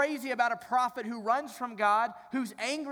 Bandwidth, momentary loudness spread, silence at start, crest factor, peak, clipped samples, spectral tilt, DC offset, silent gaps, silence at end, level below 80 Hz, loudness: over 20 kHz; 9 LU; 0 s; 16 dB; -14 dBFS; under 0.1%; -3 dB/octave; under 0.1%; none; 0 s; -80 dBFS; -31 LUFS